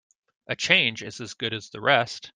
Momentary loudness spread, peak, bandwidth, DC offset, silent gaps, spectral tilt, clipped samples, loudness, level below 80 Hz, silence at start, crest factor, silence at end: 15 LU; -2 dBFS; 10 kHz; under 0.1%; none; -3 dB/octave; under 0.1%; -23 LUFS; -68 dBFS; 0.5 s; 24 dB; 0.05 s